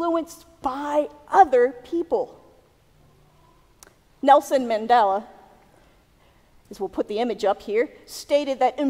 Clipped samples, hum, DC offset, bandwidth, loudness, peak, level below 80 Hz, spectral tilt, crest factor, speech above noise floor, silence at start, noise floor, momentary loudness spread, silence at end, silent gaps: under 0.1%; none; under 0.1%; 16 kHz; -22 LUFS; -2 dBFS; -60 dBFS; -4 dB/octave; 22 dB; 36 dB; 0 s; -57 dBFS; 13 LU; 0 s; none